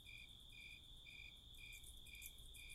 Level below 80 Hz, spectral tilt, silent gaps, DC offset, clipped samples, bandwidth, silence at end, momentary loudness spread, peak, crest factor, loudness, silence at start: -64 dBFS; -1 dB/octave; none; under 0.1%; under 0.1%; 16 kHz; 0 s; 3 LU; -38 dBFS; 20 dB; -57 LUFS; 0 s